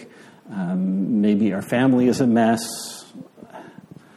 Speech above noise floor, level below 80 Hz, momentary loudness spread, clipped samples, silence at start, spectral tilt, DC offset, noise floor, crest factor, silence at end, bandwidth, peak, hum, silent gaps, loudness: 25 dB; -64 dBFS; 24 LU; under 0.1%; 0 s; -6 dB/octave; under 0.1%; -44 dBFS; 16 dB; 0.45 s; 13.5 kHz; -6 dBFS; none; none; -20 LUFS